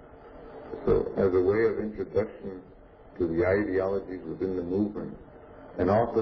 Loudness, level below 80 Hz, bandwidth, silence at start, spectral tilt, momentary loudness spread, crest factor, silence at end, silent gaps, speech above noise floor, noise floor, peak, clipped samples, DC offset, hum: -28 LUFS; -50 dBFS; 5.4 kHz; 0 s; -10 dB/octave; 20 LU; 16 dB; 0 s; none; 20 dB; -47 dBFS; -12 dBFS; under 0.1%; under 0.1%; none